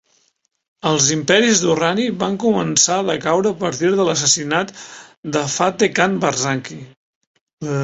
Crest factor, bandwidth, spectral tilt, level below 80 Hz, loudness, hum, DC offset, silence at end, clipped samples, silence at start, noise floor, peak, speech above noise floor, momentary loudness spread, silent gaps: 18 dB; 8.2 kHz; -3 dB/octave; -58 dBFS; -17 LUFS; none; under 0.1%; 0 s; under 0.1%; 0.85 s; -65 dBFS; 0 dBFS; 47 dB; 13 LU; 5.17-5.23 s, 6.97-7.21 s, 7.27-7.35 s, 7.41-7.47 s, 7.53-7.57 s